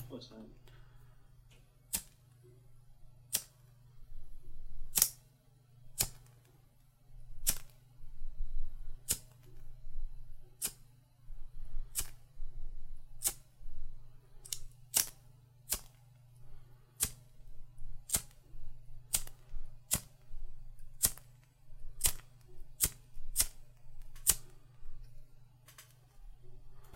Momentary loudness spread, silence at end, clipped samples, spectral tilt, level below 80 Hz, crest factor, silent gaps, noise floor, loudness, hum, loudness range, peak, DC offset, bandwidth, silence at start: 26 LU; 0 s; under 0.1%; -0.5 dB/octave; -44 dBFS; 34 dB; none; -64 dBFS; -36 LUFS; none; 8 LU; -4 dBFS; under 0.1%; 16.5 kHz; 0 s